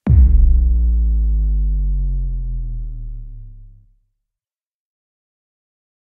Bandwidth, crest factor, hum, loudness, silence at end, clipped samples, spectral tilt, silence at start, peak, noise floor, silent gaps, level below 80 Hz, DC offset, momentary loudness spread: 1.4 kHz; 14 dB; none; -18 LUFS; 2.35 s; under 0.1%; -12.5 dB/octave; 0.05 s; -2 dBFS; -90 dBFS; none; -18 dBFS; under 0.1%; 20 LU